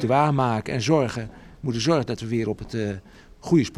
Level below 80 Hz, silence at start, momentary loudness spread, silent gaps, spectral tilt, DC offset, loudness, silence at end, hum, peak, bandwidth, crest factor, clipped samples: -50 dBFS; 0 s; 13 LU; none; -6 dB/octave; under 0.1%; -24 LUFS; 0 s; none; -6 dBFS; 12 kHz; 16 dB; under 0.1%